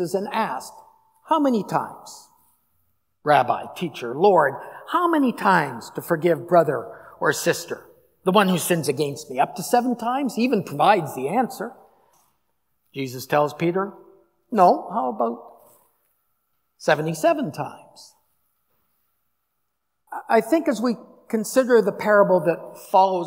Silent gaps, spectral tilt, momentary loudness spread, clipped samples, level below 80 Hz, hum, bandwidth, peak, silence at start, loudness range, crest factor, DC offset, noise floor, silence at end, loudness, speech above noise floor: none; -5 dB/octave; 15 LU; under 0.1%; -76 dBFS; none; 16 kHz; -2 dBFS; 0 s; 6 LU; 20 dB; under 0.1%; -78 dBFS; 0 s; -21 LUFS; 57 dB